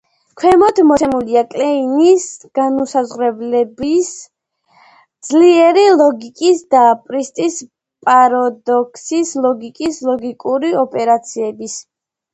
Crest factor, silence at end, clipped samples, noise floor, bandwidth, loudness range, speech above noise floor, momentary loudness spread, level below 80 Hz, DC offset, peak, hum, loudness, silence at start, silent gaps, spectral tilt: 14 dB; 0.5 s; under 0.1%; -54 dBFS; 9 kHz; 5 LU; 41 dB; 12 LU; -54 dBFS; under 0.1%; 0 dBFS; none; -14 LUFS; 0.35 s; none; -4 dB/octave